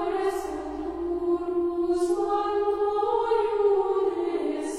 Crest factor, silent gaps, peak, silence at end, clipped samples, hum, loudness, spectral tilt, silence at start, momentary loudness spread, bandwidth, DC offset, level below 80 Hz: 12 dB; none; -12 dBFS; 0 s; under 0.1%; none; -26 LUFS; -5 dB/octave; 0 s; 8 LU; 13 kHz; under 0.1%; -54 dBFS